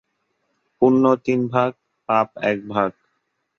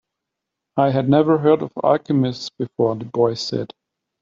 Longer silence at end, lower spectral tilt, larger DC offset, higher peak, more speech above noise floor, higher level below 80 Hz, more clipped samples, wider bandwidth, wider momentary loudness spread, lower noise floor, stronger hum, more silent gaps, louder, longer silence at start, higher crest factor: about the same, 0.65 s vs 0.55 s; about the same, -8 dB/octave vs -7 dB/octave; neither; about the same, -4 dBFS vs -2 dBFS; second, 54 dB vs 63 dB; about the same, -62 dBFS vs -60 dBFS; neither; second, 6.8 kHz vs 7.6 kHz; second, 8 LU vs 12 LU; second, -72 dBFS vs -82 dBFS; neither; neither; about the same, -20 LUFS vs -19 LUFS; about the same, 0.8 s vs 0.75 s; about the same, 18 dB vs 16 dB